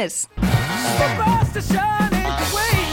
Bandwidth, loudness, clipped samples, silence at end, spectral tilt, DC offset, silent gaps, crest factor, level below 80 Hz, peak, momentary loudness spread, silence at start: 17 kHz; -19 LUFS; under 0.1%; 0 s; -4.5 dB/octave; under 0.1%; none; 14 dB; -30 dBFS; -6 dBFS; 3 LU; 0 s